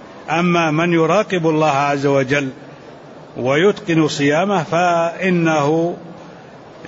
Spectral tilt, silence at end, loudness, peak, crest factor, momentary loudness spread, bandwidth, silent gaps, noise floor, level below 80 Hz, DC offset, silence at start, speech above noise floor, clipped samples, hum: -6 dB/octave; 0 s; -16 LUFS; -4 dBFS; 14 dB; 10 LU; 8 kHz; none; -38 dBFS; -58 dBFS; under 0.1%; 0 s; 23 dB; under 0.1%; none